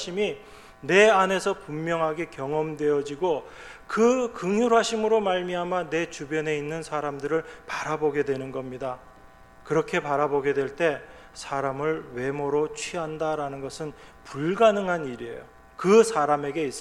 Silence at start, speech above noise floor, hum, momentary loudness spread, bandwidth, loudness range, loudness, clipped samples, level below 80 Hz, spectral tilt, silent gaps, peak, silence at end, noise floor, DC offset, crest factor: 0 s; 25 dB; none; 14 LU; 12.5 kHz; 5 LU; -25 LUFS; under 0.1%; -56 dBFS; -5 dB/octave; none; -6 dBFS; 0 s; -50 dBFS; under 0.1%; 20 dB